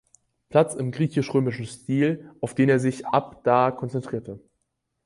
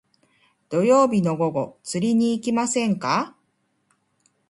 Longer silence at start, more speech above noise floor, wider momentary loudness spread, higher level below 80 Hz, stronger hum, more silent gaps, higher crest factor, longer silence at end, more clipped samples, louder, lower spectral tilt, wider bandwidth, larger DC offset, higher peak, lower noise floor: second, 0.5 s vs 0.7 s; first, 54 dB vs 49 dB; about the same, 12 LU vs 11 LU; about the same, -62 dBFS vs -66 dBFS; neither; neither; about the same, 20 dB vs 18 dB; second, 0.65 s vs 1.2 s; neither; about the same, -24 LUFS vs -22 LUFS; first, -7 dB/octave vs -5.5 dB/octave; about the same, 11.5 kHz vs 11.5 kHz; neither; about the same, -4 dBFS vs -6 dBFS; first, -77 dBFS vs -70 dBFS